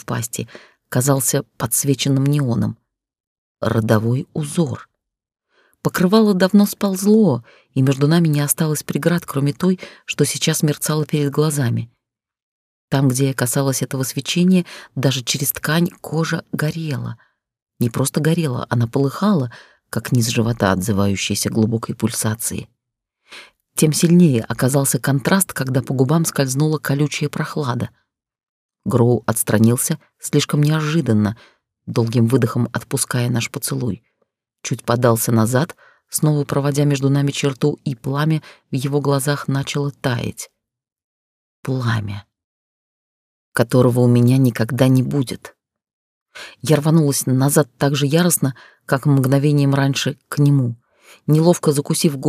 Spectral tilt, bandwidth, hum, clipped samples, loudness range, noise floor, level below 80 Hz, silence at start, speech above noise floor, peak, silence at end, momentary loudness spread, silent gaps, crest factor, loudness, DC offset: -5.5 dB/octave; 16 kHz; none; under 0.1%; 5 LU; -81 dBFS; -56 dBFS; 0.1 s; 64 dB; -2 dBFS; 0 s; 11 LU; 3.20-3.55 s, 12.42-12.88 s, 17.62-17.66 s, 28.49-28.69 s, 41.04-41.63 s, 42.44-43.52 s, 45.93-46.26 s; 18 dB; -18 LUFS; under 0.1%